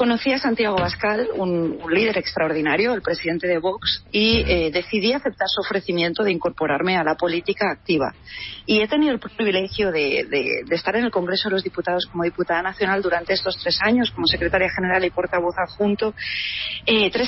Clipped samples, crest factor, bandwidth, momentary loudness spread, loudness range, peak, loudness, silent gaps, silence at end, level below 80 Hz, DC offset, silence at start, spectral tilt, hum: under 0.1%; 16 dB; 6 kHz; 5 LU; 2 LU; -4 dBFS; -21 LUFS; none; 0 s; -42 dBFS; under 0.1%; 0 s; -7.5 dB/octave; none